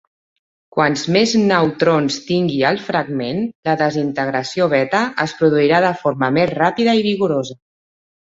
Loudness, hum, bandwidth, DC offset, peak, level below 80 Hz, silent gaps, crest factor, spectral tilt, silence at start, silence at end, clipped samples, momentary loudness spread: -17 LUFS; none; 8 kHz; under 0.1%; 0 dBFS; -56 dBFS; 3.55-3.63 s; 16 dB; -5.5 dB/octave; 0.75 s; 0.7 s; under 0.1%; 6 LU